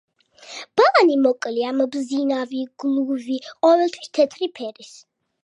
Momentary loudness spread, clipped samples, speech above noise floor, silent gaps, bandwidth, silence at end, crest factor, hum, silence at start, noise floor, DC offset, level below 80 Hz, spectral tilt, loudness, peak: 13 LU; under 0.1%; 22 dB; none; 10 kHz; 0.55 s; 18 dB; none; 0.45 s; -43 dBFS; under 0.1%; -78 dBFS; -3.5 dB/octave; -20 LUFS; -2 dBFS